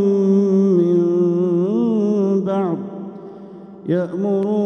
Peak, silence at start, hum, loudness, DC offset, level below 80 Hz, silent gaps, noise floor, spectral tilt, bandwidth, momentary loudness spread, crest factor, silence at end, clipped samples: -6 dBFS; 0 s; none; -18 LUFS; under 0.1%; -70 dBFS; none; -37 dBFS; -10 dB/octave; 6.6 kHz; 18 LU; 12 dB; 0 s; under 0.1%